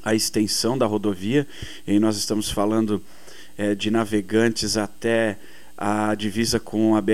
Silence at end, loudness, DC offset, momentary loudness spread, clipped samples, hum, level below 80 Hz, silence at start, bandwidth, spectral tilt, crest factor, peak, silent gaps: 0 s; -22 LUFS; 1%; 7 LU; under 0.1%; none; -50 dBFS; 0.05 s; 15.5 kHz; -4.5 dB/octave; 16 dB; -6 dBFS; none